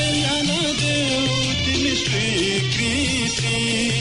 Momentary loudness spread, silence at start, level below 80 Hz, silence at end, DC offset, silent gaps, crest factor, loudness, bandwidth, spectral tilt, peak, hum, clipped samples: 1 LU; 0 s; -42 dBFS; 0 s; under 0.1%; none; 10 dB; -19 LUFS; 11 kHz; -3.5 dB/octave; -10 dBFS; none; under 0.1%